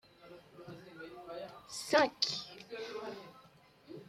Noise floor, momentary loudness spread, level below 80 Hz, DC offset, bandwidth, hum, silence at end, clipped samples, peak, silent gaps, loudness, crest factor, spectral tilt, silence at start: -62 dBFS; 25 LU; -76 dBFS; under 0.1%; 15.5 kHz; none; 0 s; under 0.1%; -14 dBFS; none; -36 LUFS; 26 dB; -2.5 dB/octave; 0.2 s